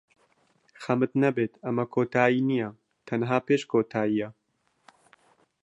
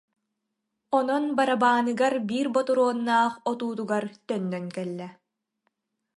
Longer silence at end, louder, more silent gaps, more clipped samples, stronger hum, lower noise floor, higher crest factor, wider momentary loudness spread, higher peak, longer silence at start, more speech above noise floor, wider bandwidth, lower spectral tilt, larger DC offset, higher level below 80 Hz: first, 1.35 s vs 1.05 s; about the same, -26 LUFS vs -25 LUFS; neither; neither; neither; second, -67 dBFS vs -81 dBFS; about the same, 22 dB vs 18 dB; about the same, 9 LU vs 11 LU; about the same, -6 dBFS vs -8 dBFS; about the same, 0.8 s vs 0.9 s; second, 41 dB vs 56 dB; second, 8.2 kHz vs 11.5 kHz; first, -7.5 dB/octave vs -5.5 dB/octave; neither; first, -72 dBFS vs -78 dBFS